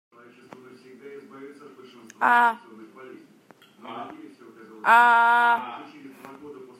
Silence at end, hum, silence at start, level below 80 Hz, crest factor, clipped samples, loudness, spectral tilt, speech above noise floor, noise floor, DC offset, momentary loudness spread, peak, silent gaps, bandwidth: 0.25 s; none; 1.05 s; -86 dBFS; 20 dB; under 0.1%; -19 LUFS; -3 dB/octave; 33 dB; -55 dBFS; under 0.1%; 27 LU; -4 dBFS; none; 14 kHz